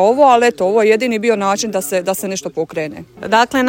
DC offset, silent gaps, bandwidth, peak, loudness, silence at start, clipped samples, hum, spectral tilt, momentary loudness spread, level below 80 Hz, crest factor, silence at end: under 0.1%; none; 16.5 kHz; 0 dBFS; -15 LUFS; 0 s; under 0.1%; none; -3.5 dB/octave; 12 LU; -56 dBFS; 14 dB; 0 s